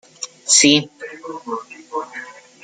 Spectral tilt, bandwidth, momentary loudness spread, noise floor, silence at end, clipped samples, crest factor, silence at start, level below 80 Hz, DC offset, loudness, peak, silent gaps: -1.5 dB/octave; 10.5 kHz; 22 LU; -36 dBFS; 0.3 s; under 0.1%; 20 dB; 0.2 s; -64 dBFS; under 0.1%; -14 LUFS; 0 dBFS; none